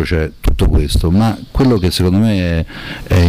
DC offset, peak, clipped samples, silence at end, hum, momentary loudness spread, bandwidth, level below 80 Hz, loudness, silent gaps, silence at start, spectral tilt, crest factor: under 0.1%; -6 dBFS; under 0.1%; 0 s; none; 7 LU; 16 kHz; -20 dBFS; -15 LUFS; none; 0 s; -6.5 dB/octave; 8 dB